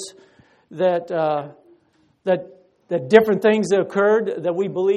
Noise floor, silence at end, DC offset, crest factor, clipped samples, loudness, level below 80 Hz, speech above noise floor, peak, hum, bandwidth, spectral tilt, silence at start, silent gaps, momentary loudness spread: -61 dBFS; 0 s; under 0.1%; 20 dB; under 0.1%; -20 LUFS; -66 dBFS; 42 dB; 0 dBFS; none; 13 kHz; -6 dB/octave; 0 s; none; 13 LU